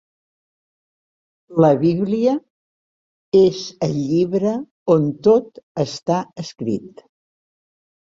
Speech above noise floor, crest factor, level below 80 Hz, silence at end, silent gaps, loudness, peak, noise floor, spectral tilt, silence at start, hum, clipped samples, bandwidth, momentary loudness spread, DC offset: over 72 dB; 18 dB; -60 dBFS; 1.1 s; 2.50-3.32 s, 4.71-4.86 s, 5.63-5.75 s; -19 LUFS; -2 dBFS; under -90 dBFS; -7.5 dB/octave; 1.5 s; none; under 0.1%; 7.6 kHz; 11 LU; under 0.1%